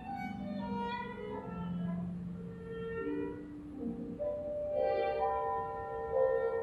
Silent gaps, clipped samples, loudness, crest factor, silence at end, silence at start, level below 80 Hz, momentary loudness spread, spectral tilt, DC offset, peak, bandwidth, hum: none; under 0.1%; -37 LUFS; 16 dB; 0 s; 0 s; -58 dBFS; 10 LU; -8.5 dB/octave; under 0.1%; -20 dBFS; 11.5 kHz; none